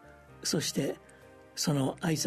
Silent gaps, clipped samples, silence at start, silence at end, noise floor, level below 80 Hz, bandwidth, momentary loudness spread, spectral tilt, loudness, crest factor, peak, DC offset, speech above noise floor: none; under 0.1%; 0.05 s; 0 s; -55 dBFS; -62 dBFS; 13.5 kHz; 11 LU; -4 dB/octave; -32 LUFS; 16 dB; -16 dBFS; under 0.1%; 24 dB